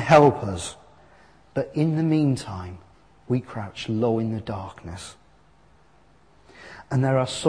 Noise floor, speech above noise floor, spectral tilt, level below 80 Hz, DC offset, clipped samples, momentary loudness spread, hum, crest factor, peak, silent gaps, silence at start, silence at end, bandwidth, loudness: -58 dBFS; 35 dB; -6.5 dB/octave; -54 dBFS; 0.1%; under 0.1%; 18 LU; none; 22 dB; -2 dBFS; none; 0 s; 0 s; 10.5 kHz; -24 LUFS